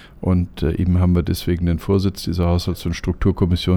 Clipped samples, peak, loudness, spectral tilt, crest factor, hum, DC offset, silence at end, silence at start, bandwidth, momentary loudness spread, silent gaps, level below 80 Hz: under 0.1%; -4 dBFS; -20 LUFS; -7.5 dB/octave; 14 dB; none; under 0.1%; 0 s; 0 s; 16 kHz; 5 LU; none; -30 dBFS